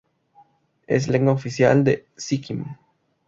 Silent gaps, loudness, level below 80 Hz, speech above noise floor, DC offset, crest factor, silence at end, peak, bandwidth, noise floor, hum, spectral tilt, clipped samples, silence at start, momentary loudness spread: none; -21 LUFS; -56 dBFS; 37 dB; under 0.1%; 20 dB; 0.55 s; -4 dBFS; 7.8 kHz; -57 dBFS; none; -6.5 dB/octave; under 0.1%; 0.9 s; 14 LU